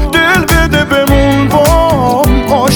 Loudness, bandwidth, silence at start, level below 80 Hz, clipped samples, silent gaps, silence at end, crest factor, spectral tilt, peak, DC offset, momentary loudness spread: -9 LUFS; over 20 kHz; 0 s; -16 dBFS; under 0.1%; none; 0 s; 8 dB; -5 dB/octave; 0 dBFS; under 0.1%; 2 LU